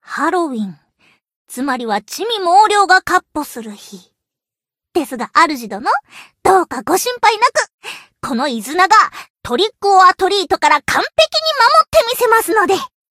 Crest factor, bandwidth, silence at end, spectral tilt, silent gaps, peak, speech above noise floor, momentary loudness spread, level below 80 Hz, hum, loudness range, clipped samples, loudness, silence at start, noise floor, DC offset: 16 dB; 16 kHz; 0.25 s; -2 dB/octave; 1.35-1.45 s, 7.74-7.78 s, 9.30-9.34 s; 0 dBFS; 73 dB; 14 LU; -50 dBFS; none; 5 LU; under 0.1%; -14 LUFS; 0.1 s; -87 dBFS; under 0.1%